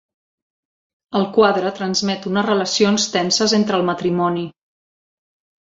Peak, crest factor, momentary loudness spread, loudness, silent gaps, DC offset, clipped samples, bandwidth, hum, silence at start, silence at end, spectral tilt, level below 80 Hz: -2 dBFS; 18 dB; 6 LU; -18 LUFS; none; under 0.1%; under 0.1%; 7.8 kHz; none; 1.1 s; 1.1 s; -4 dB/octave; -60 dBFS